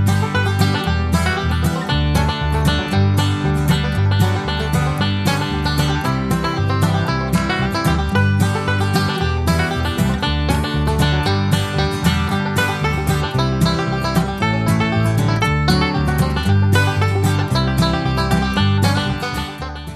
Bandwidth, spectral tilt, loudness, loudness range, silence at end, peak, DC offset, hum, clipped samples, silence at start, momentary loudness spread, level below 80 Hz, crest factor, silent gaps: 14 kHz; -6 dB/octave; -18 LUFS; 1 LU; 0 s; -2 dBFS; under 0.1%; none; under 0.1%; 0 s; 3 LU; -28 dBFS; 16 dB; none